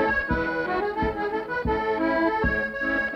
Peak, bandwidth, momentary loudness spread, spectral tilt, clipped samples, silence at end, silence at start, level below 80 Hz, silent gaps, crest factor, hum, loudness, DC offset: -12 dBFS; 6.6 kHz; 4 LU; -7.5 dB/octave; under 0.1%; 0 s; 0 s; -38 dBFS; none; 14 dB; none; -25 LUFS; under 0.1%